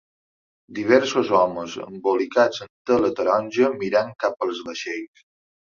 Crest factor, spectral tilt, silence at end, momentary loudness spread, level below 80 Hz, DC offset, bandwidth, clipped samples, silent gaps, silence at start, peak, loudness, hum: 20 dB; -4.5 dB/octave; 0.75 s; 13 LU; -64 dBFS; under 0.1%; 7.4 kHz; under 0.1%; 2.70-2.85 s; 0.7 s; -2 dBFS; -22 LUFS; none